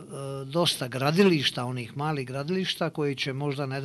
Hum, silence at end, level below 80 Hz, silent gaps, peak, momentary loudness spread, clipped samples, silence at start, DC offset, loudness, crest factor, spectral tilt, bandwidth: none; 0 s; -66 dBFS; none; -8 dBFS; 10 LU; under 0.1%; 0 s; under 0.1%; -27 LUFS; 20 dB; -5 dB/octave; 12 kHz